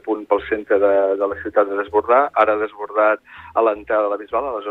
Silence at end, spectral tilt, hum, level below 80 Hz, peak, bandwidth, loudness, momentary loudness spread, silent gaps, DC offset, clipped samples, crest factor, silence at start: 0 s; -7 dB/octave; none; -54 dBFS; -2 dBFS; 4.1 kHz; -19 LUFS; 7 LU; none; under 0.1%; under 0.1%; 16 dB; 0.05 s